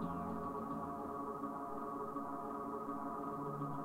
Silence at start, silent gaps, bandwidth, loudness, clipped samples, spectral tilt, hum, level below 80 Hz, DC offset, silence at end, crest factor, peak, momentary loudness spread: 0 s; none; 16 kHz; -43 LUFS; under 0.1%; -8.5 dB/octave; none; -68 dBFS; under 0.1%; 0 s; 14 dB; -28 dBFS; 1 LU